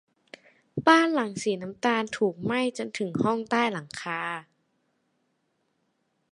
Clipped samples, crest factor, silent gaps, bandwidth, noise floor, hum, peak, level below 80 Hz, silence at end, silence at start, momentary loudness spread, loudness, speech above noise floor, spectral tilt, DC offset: under 0.1%; 24 dB; none; 11.5 kHz; -74 dBFS; none; -4 dBFS; -68 dBFS; 1.9 s; 0.75 s; 13 LU; -26 LUFS; 48 dB; -5 dB/octave; under 0.1%